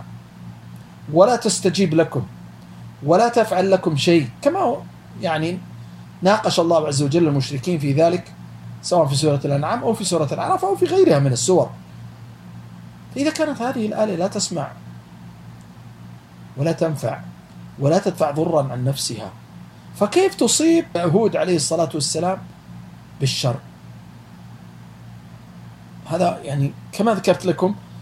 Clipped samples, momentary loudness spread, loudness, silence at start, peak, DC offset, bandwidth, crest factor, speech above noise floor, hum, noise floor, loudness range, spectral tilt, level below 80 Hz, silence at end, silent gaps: under 0.1%; 24 LU; -19 LUFS; 0 s; 0 dBFS; under 0.1%; 15.5 kHz; 20 dB; 22 dB; none; -41 dBFS; 8 LU; -5 dB/octave; -56 dBFS; 0 s; none